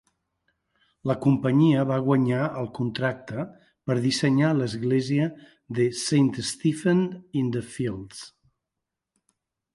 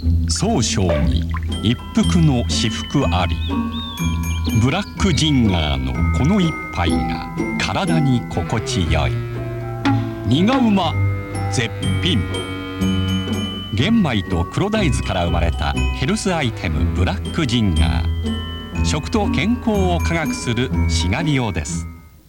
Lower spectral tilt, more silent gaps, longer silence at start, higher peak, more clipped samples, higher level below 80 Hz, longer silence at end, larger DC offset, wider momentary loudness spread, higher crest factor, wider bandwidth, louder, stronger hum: about the same, -6 dB/octave vs -5.5 dB/octave; neither; first, 1.05 s vs 0 s; second, -8 dBFS vs -4 dBFS; neither; second, -62 dBFS vs -28 dBFS; first, 1.45 s vs 0.2 s; neither; first, 13 LU vs 7 LU; about the same, 16 dB vs 14 dB; second, 11.5 kHz vs 16.5 kHz; second, -25 LUFS vs -19 LUFS; neither